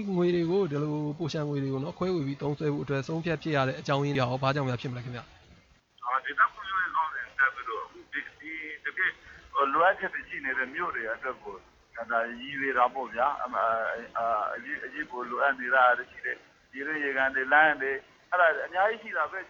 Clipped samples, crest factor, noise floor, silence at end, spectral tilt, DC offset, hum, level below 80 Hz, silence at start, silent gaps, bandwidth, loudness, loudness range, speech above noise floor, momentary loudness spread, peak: under 0.1%; 20 dB; -60 dBFS; 0 s; -6.5 dB/octave; under 0.1%; none; -64 dBFS; 0 s; none; 7.4 kHz; -29 LUFS; 4 LU; 31 dB; 13 LU; -10 dBFS